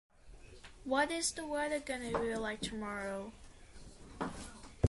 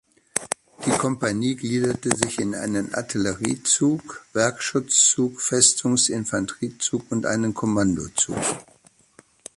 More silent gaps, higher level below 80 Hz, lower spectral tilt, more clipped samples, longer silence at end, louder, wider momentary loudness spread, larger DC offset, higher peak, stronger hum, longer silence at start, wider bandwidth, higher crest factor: neither; about the same, -54 dBFS vs -54 dBFS; about the same, -4 dB/octave vs -3 dB/octave; neither; second, 0 s vs 0.95 s; second, -37 LUFS vs -22 LUFS; first, 23 LU vs 11 LU; neither; second, -16 dBFS vs 0 dBFS; neither; about the same, 0.25 s vs 0.35 s; about the same, 12 kHz vs 11.5 kHz; about the same, 24 dB vs 24 dB